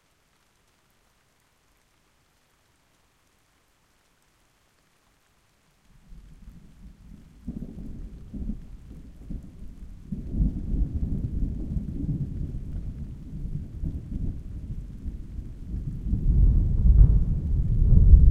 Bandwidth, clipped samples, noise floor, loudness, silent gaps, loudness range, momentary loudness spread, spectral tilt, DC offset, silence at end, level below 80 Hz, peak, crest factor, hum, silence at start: 1.6 kHz; under 0.1%; -66 dBFS; -28 LUFS; none; 17 LU; 22 LU; -10.5 dB/octave; under 0.1%; 0 s; -26 dBFS; -2 dBFS; 24 dB; none; 6.1 s